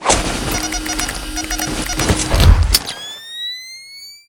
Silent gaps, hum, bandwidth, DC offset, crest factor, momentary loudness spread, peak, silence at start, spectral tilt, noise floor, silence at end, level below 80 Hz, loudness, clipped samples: none; none; 19 kHz; under 0.1%; 18 dB; 15 LU; 0 dBFS; 0 s; -3.5 dB/octave; -37 dBFS; 0.1 s; -20 dBFS; -17 LUFS; 0.1%